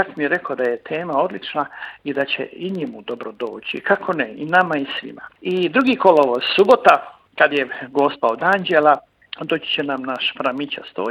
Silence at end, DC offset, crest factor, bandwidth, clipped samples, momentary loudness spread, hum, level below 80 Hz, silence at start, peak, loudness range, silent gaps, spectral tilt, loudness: 0 s; under 0.1%; 20 dB; 12 kHz; under 0.1%; 14 LU; none; -66 dBFS; 0 s; 0 dBFS; 8 LU; none; -5.5 dB/octave; -19 LUFS